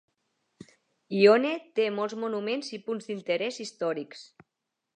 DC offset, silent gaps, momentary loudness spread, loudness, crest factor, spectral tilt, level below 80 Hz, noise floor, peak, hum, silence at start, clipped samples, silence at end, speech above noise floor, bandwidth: under 0.1%; none; 15 LU; -28 LUFS; 22 dB; -5 dB/octave; -84 dBFS; -84 dBFS; -6 dBFS; none; 1.1 s; under 0.1%; 0.75 s; 57 dB; 9.4 kHz